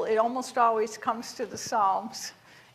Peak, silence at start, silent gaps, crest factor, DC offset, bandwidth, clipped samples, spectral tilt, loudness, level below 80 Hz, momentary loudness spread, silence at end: -12 dBFS; 0 s; none; 18 dB; under 0.1%; 14.5 kHz; under 0.1%; -3 dB/octave; -28 LUFS; -74 dBFS; 12 LU; 0.4 s